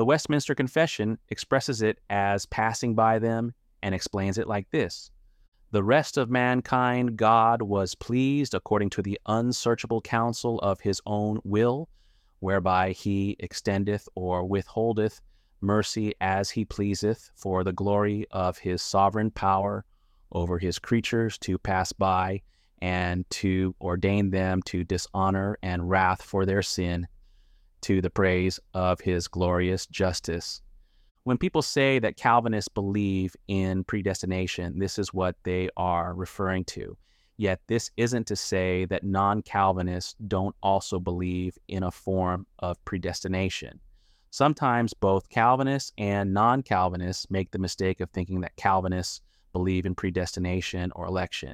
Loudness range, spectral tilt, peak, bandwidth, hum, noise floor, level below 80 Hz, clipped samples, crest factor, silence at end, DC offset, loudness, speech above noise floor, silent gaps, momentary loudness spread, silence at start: 4 LU; -5.5 dB/octave; -8 dBFS; 15 kHz; none; -58 dBFS; -50 dBFS; under 0.1%; 20 dB; 0 s; under 0.1%; -27 LUFS; 32 dB; 5.48-5.52 s, 31.11-31.15 s; 9 LU; 0 s